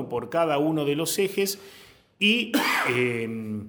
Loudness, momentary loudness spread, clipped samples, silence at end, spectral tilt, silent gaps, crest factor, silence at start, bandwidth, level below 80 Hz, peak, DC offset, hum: -24 LUFS; 7 LU; under 0.1%; 0 s; -4 dB/octave; none; 18 dB; 0 s; over 20 kHz; -66 dBFS; -8 dBFS; under 0.1%; none